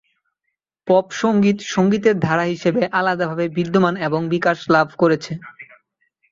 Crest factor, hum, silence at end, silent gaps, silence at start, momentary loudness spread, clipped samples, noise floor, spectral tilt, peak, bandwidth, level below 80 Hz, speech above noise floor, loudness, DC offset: 16 dB; none; 0.7 s; none; 0.85 s; 6 LU; under 0.1%; -77 dBFS; -6.5 dB/octave; -2 dBFS; 7.6 kHz; -58 dBFS; 60 dB; -18 LUFS; under 0.1%